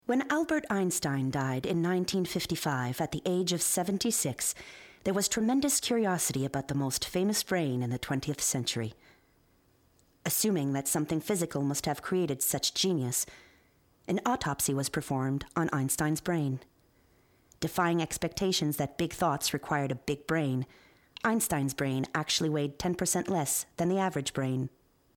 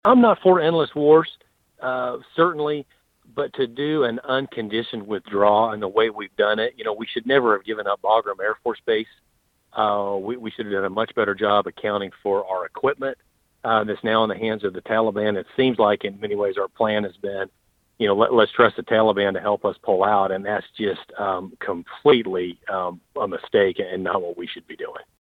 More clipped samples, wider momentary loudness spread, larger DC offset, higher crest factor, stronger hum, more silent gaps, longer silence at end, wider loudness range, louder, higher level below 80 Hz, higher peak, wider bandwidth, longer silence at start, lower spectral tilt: neither; second, 5 LU vs 12 LU; neither; about the same, 16 dB vs 20 dB; neither; neither; first, 0.5 s vs 0.25 s; about the same, 3 LU vs 4 LU; second, -30 LUFS vs -22 LUFS; about the same, -60 dBFS vs -64 dBFS; second, -14 dBFS vs -2 dBFS; first, 19.5 kHz vs 4.8 kHz; about the same, 0.1 s vs 0.05 s; second, -4 dB/octave vs -7.5 dB/octave